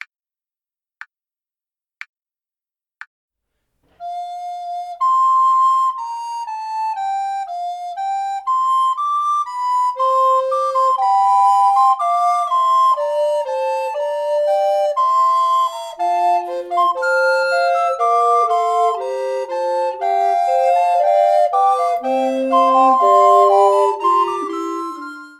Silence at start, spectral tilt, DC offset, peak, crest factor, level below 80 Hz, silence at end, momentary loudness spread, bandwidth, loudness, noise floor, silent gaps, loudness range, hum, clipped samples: 4 s; -2 dB/octave; under 0.1%; -2 dBFS; 16 dB; -70 dBFS; 0.1 s; 12 LU; 12.5 kHz; -16 LUFS; under -90 dBFS; none; 7 LU; none; under 0.1%